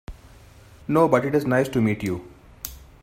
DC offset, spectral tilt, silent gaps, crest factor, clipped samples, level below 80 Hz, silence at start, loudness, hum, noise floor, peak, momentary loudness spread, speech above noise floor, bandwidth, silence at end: under 0.1%; -7 dB/octave; none; 20 dB; under 0.1%; -48 dBFS; 0.1 s; -22 LUFS; none; -48 dBFS; -4 dBFS; 18 LU; 27 dB; 16 kHz; 0.2 s